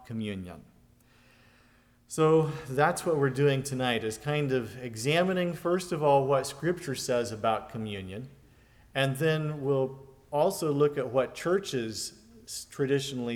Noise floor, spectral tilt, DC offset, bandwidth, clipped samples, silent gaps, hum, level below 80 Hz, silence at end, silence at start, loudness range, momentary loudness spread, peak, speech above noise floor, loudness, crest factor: -62 dBFS; -5.5 dB/octave; under 0.1%; 18.5 kHz; under 0.1%; none; none; -62 dBFS; 0 s; 0 s; 3 LU; 14 LU; -10 dBFS; 33 dB; -29 LUFS; 20 dB